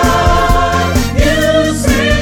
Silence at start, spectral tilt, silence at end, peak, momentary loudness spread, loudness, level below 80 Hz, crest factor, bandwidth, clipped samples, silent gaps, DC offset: 0 s; -5 dB/octave; 0 s; 0 dBFS; 2 LU; -11 LUFS; -16 dBFS; 10 dB; 20 kHz; under 0.1%; none; under 0.1%